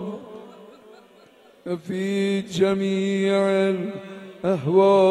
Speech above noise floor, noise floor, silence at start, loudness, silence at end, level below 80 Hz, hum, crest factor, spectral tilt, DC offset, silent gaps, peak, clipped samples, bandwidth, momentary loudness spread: 32 dB; -52 dBFS; 0 s; -22 LUFS; 0 s; -66 dBFS; none; 18 dB; -6.5 dB/octave; under 0.1%; none; -6 dBFS; under 0.1%; 11 kHz; 20 LU